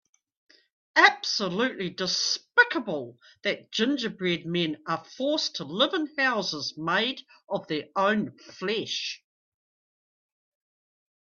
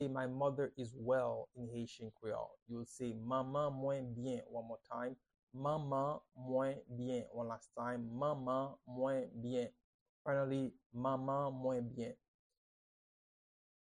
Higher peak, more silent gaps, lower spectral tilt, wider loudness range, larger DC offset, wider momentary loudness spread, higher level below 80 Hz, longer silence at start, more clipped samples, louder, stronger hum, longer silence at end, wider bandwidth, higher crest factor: first, -2 dBFS vs -26 dBFS; second, none vs 2.62-2.66 s, 5.39-5.47 s, 9.84-10.25 s, 10.86-10.90 s; second, -3 dB/octave vs -7.5 dB/octave; first, 7 LU vs 2 LU; neither; first, 13 LU vs 10 LU; about the same, -74 dBFS vs -74 dBFS; first, 0.95 s vs 0 s; neither; first, -26 LUFS vs -42 LUFS; neither; first, 2.15 s vs 1.75 s; second, 7.4 kHz vs 10 kHz; first, 26 dB vs 16 dB